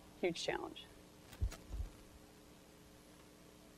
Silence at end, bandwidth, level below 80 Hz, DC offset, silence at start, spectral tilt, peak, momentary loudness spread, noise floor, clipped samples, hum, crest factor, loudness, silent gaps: 0 s; 13 kHz; -52 dBFS; under 0.1%; 0 s; -4.5 dB/octave; -24 dBFS; 20 LU; -61 dBFS; under 0.1%; none; 22 dB; -44 LUFS; none